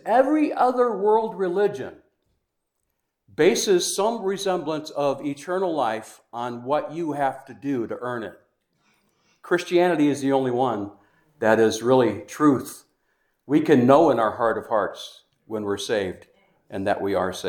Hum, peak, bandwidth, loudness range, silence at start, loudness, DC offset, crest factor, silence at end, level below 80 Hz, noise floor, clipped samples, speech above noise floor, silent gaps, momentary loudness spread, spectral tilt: none; -2 dBFS; 19 kHz; 7 LU; 0.05 s; -22 LUFS; under 0.1%; 22 dB; 0 s; -68 dBFS; -77 dBFS; under 0.1%; 55 dB; none; 14 LU; -5 dB/octave